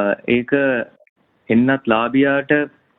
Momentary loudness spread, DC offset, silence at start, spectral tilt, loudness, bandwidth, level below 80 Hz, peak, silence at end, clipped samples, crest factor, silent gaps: 4 LU; under 0.1%; 0 s; -9.5 dB/octave; -17 LUFS; 4 kHz; -56 dBFS; -2 dBFS; 0.3 s; under 0.1%; 16 dB; 1.09-1.16 s